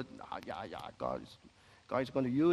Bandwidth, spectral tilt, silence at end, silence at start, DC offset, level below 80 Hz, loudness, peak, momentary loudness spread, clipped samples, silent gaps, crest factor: 12 kHz; -7.5 dB/octave; 0 s; 0 s; under 0.1%; -66 dBFS; -38 LUFS; -18 dBFS; 12 LU; under 0.1%; none; 18 dB